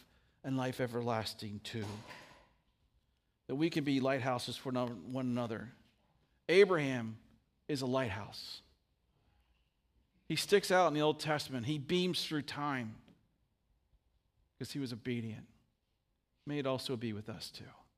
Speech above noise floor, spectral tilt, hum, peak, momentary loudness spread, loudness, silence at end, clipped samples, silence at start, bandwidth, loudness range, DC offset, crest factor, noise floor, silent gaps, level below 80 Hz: 46 dB; -5 dB/octave; none; -14 dBFS; 18 LU; -36 LUFS; 0.25 s; under 0.1%; 0.45 s; 15.5 kHz; 9 LU; under 0.1%; 24 dB; -81 dBFS; none; -74 dBFS